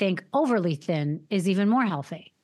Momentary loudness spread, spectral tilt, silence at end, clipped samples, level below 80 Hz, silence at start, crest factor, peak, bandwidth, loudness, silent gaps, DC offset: 6 LU; -7 dB/octave; 0.2 s; under 0.1%; -88 dBFS; 0 s; 14 dB; -10 dBFS; 12.5 kHz; -25 LUFS; none; under 0.1%